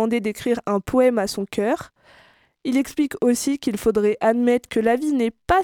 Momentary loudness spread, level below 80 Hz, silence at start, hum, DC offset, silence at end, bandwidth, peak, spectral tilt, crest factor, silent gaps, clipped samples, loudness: 6 LU; -48 dBFS; 0 s; none; under 0.1%; 0 s; 17.5 kHz; -6 dBFS; -5 dB/octave; 16 dB; none; under 0.1%; -21 LUFS